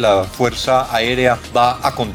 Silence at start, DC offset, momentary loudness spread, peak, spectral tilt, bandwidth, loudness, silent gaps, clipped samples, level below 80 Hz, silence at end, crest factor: 0 s; under 0.1%; 4 LU; 0 dBFS; -4.5 dB/octave; 18.5 kHz; -16 LUFS; none; under 0.1%; -38 dBFS; 0 s; 16 dB